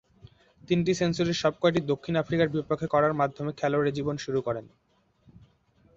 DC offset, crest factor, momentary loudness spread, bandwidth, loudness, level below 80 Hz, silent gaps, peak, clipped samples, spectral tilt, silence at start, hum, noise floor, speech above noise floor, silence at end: under 0.1%; 18 dB; 6 LU; 7.8 kHz; -27 LUFS; -58 dBFS; none; -10 dBFS; under 0.1%; -6 dB/octave; 0.7 s; none; -63 dBFS; 37 dB; 1.3 s